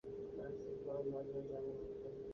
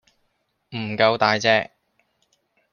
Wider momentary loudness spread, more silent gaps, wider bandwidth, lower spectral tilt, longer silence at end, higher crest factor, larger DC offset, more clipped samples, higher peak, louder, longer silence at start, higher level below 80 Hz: second, 5 LU vs 17 LU; neither; about the same, 6.6 kHz vs 7 kHz; first, -8.5 dB/octave vs -4 dB/octave; second, 0 s vs 1.1 s; second, 14 dB vs 22 dB; neither; neither; second, -32 dBFS vs -2 dBFS; second, -46 LUFS vs -20 LUFS; second, 0.05 s vs 0.7 s; about the same, -68 dBFS vs -66 dBFS